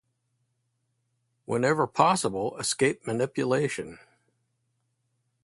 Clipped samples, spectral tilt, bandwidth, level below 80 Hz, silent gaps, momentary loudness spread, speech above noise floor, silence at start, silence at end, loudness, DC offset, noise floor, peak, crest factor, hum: under 0.1%; -4.5 dB/octave; 12 kHz; -66 dBFS; none; 9 LU; 50 dB; 1.5 s; 1.45 s; -26 LUFS; under 0.1%; -76 dBFS; -6 dBFS; 24 dB; none